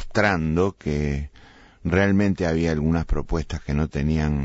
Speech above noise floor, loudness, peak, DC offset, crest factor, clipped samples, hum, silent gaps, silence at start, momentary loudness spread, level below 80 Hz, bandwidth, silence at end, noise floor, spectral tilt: 27 dB; -23 LUFS; -6 dBFS; under 0.1%; 16 dB; under 0.1%; none; none; 0 s; 8 LU; -32 dBFS; 8 kHz; 0 s; -49 dBFS; -7 dB/octave